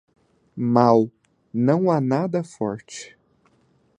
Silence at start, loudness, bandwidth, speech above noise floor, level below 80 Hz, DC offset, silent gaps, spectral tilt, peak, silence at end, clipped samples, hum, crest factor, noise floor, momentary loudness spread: 0.55 s; -21 LUFS; 10 kHz; 42 dB; -64 dBFS; under 0.1%; none; -7.5 dB/octave; -2 dBFS; 0.9 s; under 0.1%; none; 20 dB; -62 dBFS; 21 LU